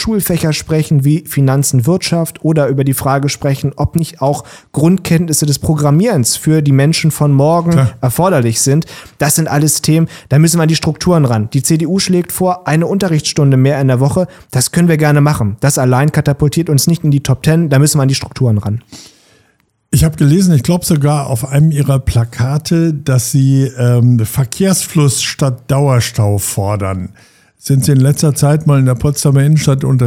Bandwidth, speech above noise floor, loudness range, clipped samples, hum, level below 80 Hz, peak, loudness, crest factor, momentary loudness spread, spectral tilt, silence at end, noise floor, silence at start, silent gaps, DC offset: 16.5 kHz; 46 dB; 2 LU; under 0.1%; none; -36 dBFS; 0 dBFS; -12 LUFS; 10 dB; 6 LU; -5.5 dB/octave; 0 s; -57 dBFS; 0 s; none; 0.1%